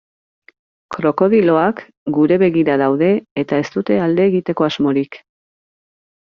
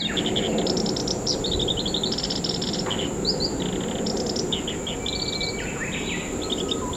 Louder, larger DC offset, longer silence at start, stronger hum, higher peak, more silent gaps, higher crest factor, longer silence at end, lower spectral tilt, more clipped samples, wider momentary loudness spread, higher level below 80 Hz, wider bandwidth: first, -16 LUFS vs -25 LUFS; neither; first, 0.9 s vs 0 s; neither; first, -2 dBFS vs -10 dBFS; first, 1.97-2.06 s, 3.31-3.36 s vs none; about the same, 14 dB vs 16 dB; first, 1.15 s vs 0 s; first, -6 dB/octave vs -3.5 dB/octave; neither; first, 7 LU vs 4 LU; second, -58 dBFS vs -42 dBFS; second, 7 kHz vs 16.5 kHz